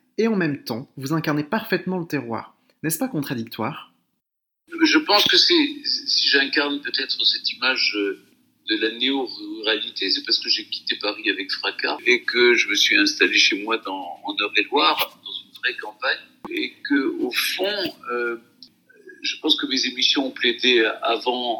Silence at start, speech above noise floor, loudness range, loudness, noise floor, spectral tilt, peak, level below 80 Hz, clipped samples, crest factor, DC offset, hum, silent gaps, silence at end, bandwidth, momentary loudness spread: 0.2 s; 58 dB; 7 LU; -20 LUFS; -80 dBFS; -3 dB/octave; -2 dBFS; -74 dBFS; under 0.1%; 20 dB; under 0.1%; none; none; 0 s; 19 kHz; 13 LU